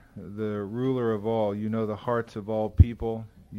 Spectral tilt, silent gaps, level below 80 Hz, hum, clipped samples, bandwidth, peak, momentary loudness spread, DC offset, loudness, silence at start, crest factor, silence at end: -9.5 dB/octave; none; -36 dBFS; none; under 0.1%; 6.4 kHz; -4 dBFS; 11 LU; under 0.1%; -28 LUFS; 0.15 s; 24 dB; 0 s